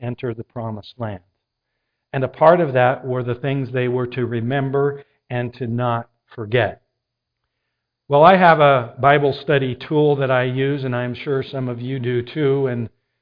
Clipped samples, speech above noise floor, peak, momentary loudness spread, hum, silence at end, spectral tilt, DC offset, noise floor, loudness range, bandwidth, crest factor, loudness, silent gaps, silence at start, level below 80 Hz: under 0.1%; 60 dB; 0 dBFS; 16 LU; none; 0.35 s; -10 dB/octave; under 0.1%; -79 dBFS; 7 LU; 5.2 kHz; 20 dB; -18 LUFS; none; 0 s; -56 dBFS